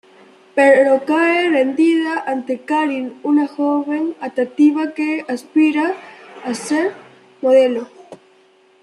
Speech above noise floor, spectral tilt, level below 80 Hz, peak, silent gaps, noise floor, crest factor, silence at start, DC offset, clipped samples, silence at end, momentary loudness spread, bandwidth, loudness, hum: 36 dB; -4 dB/octave; -72 dBFS; -2 dBFS; none; -52 dBFS; 16 dB; 0.55 s; under 0.1%; under 0.1%; 0.65 s; 10 LU; 11.5 kHz; -17 LUFS; none